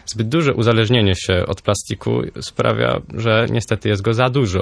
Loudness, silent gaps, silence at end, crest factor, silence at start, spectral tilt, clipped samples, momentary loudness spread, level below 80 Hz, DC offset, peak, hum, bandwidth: -18 LUFS; none; 0 s; 16 dB; 0.05 s; -5.5 dB/octave; under 0.1%; 6 LU; -42 dBFS; under 0.1%; 0 dBFS; none; 11 kHz